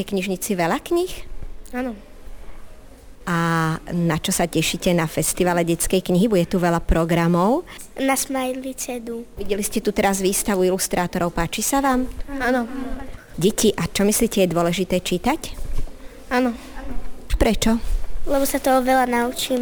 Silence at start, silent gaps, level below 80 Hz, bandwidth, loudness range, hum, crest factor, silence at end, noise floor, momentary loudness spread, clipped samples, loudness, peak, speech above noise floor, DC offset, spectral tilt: 0 s; none; -32 dBFS; over 20 kHz; 5 LU; none; 14 dB; 0 s; -41 dBFS; 14 LU; under 0.1%; -21 LUFS; -6 dBFS; 20 dB; under 0.1%; -4.5 dB/octave